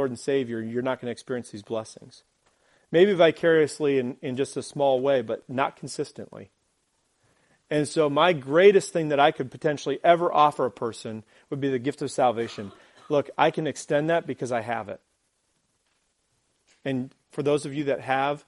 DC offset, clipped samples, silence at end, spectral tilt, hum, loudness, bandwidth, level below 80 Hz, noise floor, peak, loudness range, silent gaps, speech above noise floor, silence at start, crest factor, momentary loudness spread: under 0.1%; under 0.1%; 0.1 s; -5.5 dB/octave; none; -25 LUFS; 11.5 kHz; -70 dBFS; -72 dBFS; -4 dBFS; 9 LU; none; 48 dB; 0 s; 22 dB; 14 LU